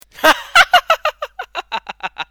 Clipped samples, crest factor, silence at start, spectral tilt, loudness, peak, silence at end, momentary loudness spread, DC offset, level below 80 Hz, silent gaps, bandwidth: 0.3%; 16 dB; 0.2 s; -0.5 dB/octave; -14 LUFS; 0 dBFS; 0.05 s; 17 LU; under 0.1%; -48 dBFS; none; over 20 kHz